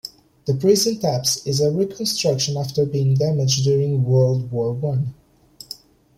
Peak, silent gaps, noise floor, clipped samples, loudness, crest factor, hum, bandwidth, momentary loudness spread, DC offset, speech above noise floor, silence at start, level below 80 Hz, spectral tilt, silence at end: -4 dBFS; none; -41 dBFS; under 0.1%; -20 LUFS; 16 dB; none; 15.5 kHz; 13 LU; under 0.1%; 22 dB; 0.05 s; -54 dBFS; -5.5 dB/octave; 0.45 s